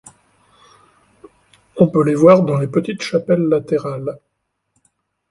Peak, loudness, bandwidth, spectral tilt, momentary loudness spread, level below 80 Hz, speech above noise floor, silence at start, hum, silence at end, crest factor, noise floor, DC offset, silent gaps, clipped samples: 0 dBFS; -16 LUFS; 11.5 kHz; -7.5 dB/octave; 17 LU; -58 dBFS; 58 dB; 1.75 s; none; 1.15 s; 18 dB; -73 dBFS; under 0.1%; none; under 0.1%